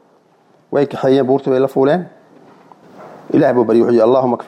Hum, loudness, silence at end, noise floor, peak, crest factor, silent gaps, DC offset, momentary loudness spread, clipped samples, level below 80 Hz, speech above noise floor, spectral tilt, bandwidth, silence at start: none; -14 LUFS; 0.05 s; -53 dBFS; -2 dBFS; 12 dB; none; under 0.1%; 7 LU; under 0.1%; -62 dBFS; 40 dB; -8.5 dB/octave; 9.2 kHz; 0.7 s